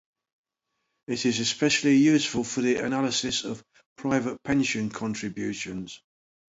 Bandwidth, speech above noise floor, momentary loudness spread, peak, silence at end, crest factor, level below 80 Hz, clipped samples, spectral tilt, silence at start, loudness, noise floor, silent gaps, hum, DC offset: 8 kHz; 55 dB; 15 LU; -10 dBFS; 0.6 s; 16 dB; -60 dBFS; under 0.1%; -4 dB/octave; 1.1 s; -26 LUFS; -80 dBFS; 3.86-3.96 s; none; under 0.1%